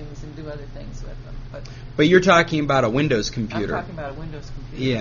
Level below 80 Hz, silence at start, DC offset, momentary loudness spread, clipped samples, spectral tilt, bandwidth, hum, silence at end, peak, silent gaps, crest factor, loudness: -38 dBFS; 0 s; under 0.1%; 21 LU; under 0.1%; -4.5 dB/octave; 7.2 kHz; none; 0 s; 0 dBFS; none; 22 dB; -19 LUFS